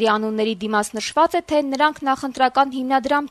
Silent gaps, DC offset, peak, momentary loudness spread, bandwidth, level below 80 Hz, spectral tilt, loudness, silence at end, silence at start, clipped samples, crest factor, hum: none; under 0.1%; -4 dBFS; 5 LU; 13.5 kHz; -56 dBFS; -3.5 dB/octave; -20 LUFS; 0.05 s; 0 s; under 0.1%; 16 dB; none